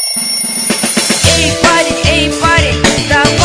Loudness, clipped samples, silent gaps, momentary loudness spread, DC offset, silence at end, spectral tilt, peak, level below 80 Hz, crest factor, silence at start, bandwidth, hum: -9 LUFS; 0.8%; none; 3 LU; under 0.1%; 0 s; -3 dB/octave; 0 dBFS; -26 dBFS; 10 dB; 0 s; 11 kHz; none